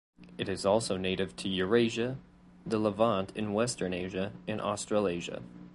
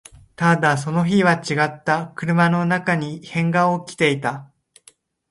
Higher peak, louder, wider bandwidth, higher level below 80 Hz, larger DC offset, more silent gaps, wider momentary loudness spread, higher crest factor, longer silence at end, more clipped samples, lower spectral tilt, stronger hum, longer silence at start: second, -12 dBFS vs -4 dBFS; second, -31 LUFS vs -19 LUFS; about the same, 11.5 kHz vs 11.5 kHz; about the same, -58 dBFS vs -58 dBFS; neither; neither; first, 11 LU vs 7 LU; about the same, 20 dB vs 18 dB; second, 0 s vs 0.85 s; neither; about the same, -5 dB/octave vs -6 dB/octave; neither; second, 0.2 s vs 0.4 s